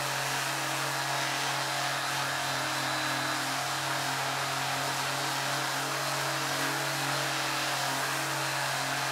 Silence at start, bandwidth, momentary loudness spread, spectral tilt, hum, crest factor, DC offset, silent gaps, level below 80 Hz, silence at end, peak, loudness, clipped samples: 0 s; 16 kHz; 1 LU; -2 dB/octave; none; 14 dB; under 0.1%; none; -70 dBFS; 0 s; -16 dBFS; -29 LUFS; under 0.1%